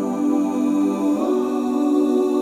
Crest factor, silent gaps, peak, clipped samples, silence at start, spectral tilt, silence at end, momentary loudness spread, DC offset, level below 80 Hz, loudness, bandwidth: 10 dB; none; -8 dBFS; under 0.1%; 0 s; -6.5 dB/octave; 0 s; 2 LU; under 0.1%; -62 dBFS; -20 LUFS; 14 kHz